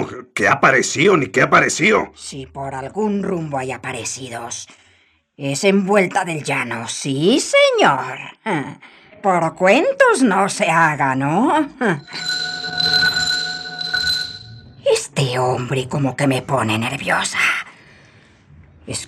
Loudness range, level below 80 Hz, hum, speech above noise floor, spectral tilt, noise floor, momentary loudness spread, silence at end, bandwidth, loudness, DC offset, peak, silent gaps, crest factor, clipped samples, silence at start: 5 LU; -56 dBFS; none; 39 dB; -4 dB/octave; -57 dBFS; 14 LU; 0 s; 14.5 kHz; -17 LUFS; under 0.1%; 0 dBFS; none; 18 dB; under 0.1%; 0 s